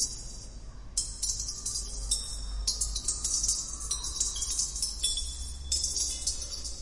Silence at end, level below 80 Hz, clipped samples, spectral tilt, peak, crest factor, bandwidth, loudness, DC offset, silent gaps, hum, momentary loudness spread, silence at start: 0 s; -40 dBFS; under 0.1%; -0.5 dB/octave; -12 dBFS; 20 dB; 11.5 kHz; -30 LUFS; under 0.1%; none; none; 10 LU; 0 s